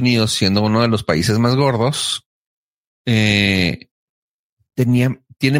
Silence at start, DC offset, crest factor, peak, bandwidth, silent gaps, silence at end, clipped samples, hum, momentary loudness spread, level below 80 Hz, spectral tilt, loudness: 0 s; under 0.1%; 16 dB; -2 dBFS; 16 kHz; 2.26-3.05 s, 3.91-4.57 s; 0 s; under 0.1%; none; 7 LU; -48 dBFS; -5 dB/octave; -16 LUFS